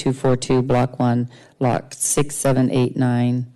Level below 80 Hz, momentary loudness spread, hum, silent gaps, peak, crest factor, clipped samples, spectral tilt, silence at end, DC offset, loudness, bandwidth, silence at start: -46 dBFS; 4 LU; none; none; -10 dBFS; 10 dB; under 0.1%; -6 dB/octave; 0.05 s; under 0.1%; -20 LUFS; 12.5 kHz; 0 s